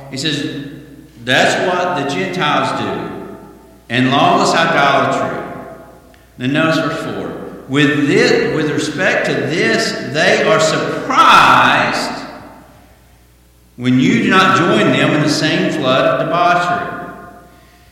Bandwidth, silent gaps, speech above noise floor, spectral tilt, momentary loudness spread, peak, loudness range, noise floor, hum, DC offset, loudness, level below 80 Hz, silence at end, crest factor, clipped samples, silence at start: 16.5 kHz; none; 34 dB; -4.5 dB/octave; 15 LU; 0 dBFS; 5 LU; -48 dBFS; none; under 0.1%; -13 LUFS; -48 dBFS; 0.5 s; 14 dB; under 0.1%; 0 s